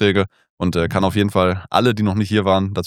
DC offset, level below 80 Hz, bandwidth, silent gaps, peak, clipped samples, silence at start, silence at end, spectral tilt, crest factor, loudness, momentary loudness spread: under 0.1%; -44 dBFS; 16 kHz; 0.50-0.57 s; 0 dBFS; under 0.1%; 0 s; 0 s; -6.5 dB/octave; 16 dB; -18 LUFS; 5 LU